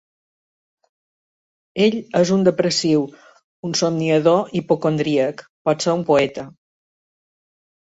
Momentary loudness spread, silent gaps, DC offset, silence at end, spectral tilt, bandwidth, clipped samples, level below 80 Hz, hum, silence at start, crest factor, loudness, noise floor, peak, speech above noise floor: 10 LU; 3.44-3.63 s, 5.49-5.65 s; under 0.1%; 1.4 s; -5 dB/octave; 8 kHz; under 0.1%; -62 dBFS; none; 1.75 s; 18 dB; -19 LUFS; under -90 dBFS; -2 dBFS; over 72 dB